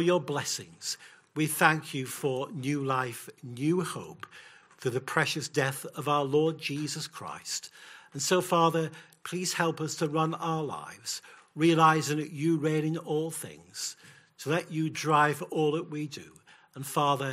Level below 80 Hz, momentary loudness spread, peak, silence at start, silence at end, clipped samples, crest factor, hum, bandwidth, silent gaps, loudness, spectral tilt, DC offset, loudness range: -76 dBFS; 16 LU; -8 dBFS; 0 s; 0 s; under 0.1%; 22 dB; none; 16 kHz; none; -29 LUFS; -4.5 dB/octave; under 0.1%; 3 LU